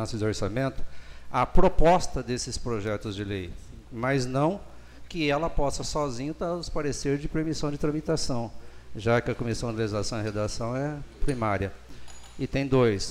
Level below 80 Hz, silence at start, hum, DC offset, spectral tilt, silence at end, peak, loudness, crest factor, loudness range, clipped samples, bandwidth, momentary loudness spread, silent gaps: -36 dBFS; 0 s; none; under 0.1%; -5.5 dB/octave; 0 s; -4 dBFS; -28 LUFS; 22 dB; 3 LU; under 0.1%; 11 kHz; 15 LU; none